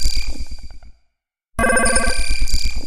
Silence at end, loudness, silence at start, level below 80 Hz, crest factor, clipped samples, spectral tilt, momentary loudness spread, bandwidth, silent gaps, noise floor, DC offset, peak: 0 s; -19 LUFS; 0 s; -22 dBFS; 14 dB; under 0.1%; -2.5 dB/octave; 19 LU; 14 kHz; none; -68 dBFS; under 0.1%; -2 dBFS